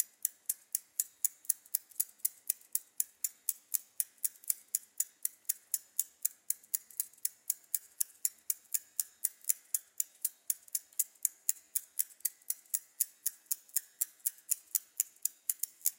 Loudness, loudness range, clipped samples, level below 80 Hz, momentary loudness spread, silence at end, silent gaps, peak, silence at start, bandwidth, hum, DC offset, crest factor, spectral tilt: -35 LUFS; 1 LU; under 0.1%; under -90 dBFS; 5 LU; 0.1 s; none; -8 dBFS; 0 s; 17 kHz; none; under 0.1%; 30 dB; 5 dB/octave